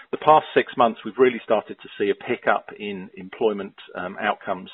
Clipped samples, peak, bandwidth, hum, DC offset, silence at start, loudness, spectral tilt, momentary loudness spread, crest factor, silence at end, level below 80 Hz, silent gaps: under 0.1%; 0 dBFS; 4.2 kHz; none; under 0.1%; 0.15 s; -22 LUFS; -3 dB/octave; 16 LU; 22 dB; 0 s; -66 dBFS; none